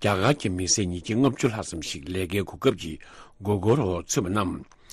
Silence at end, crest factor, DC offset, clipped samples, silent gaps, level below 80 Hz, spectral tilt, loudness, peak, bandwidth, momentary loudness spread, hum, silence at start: 0.3 s; 18 dB; under 0.1%; under 0.1%; none; -50 dBFS; -4.5 dB/octave; -26 LUFS; -8 dBFS; 13.5 kHz; 11 LU; none; 0 s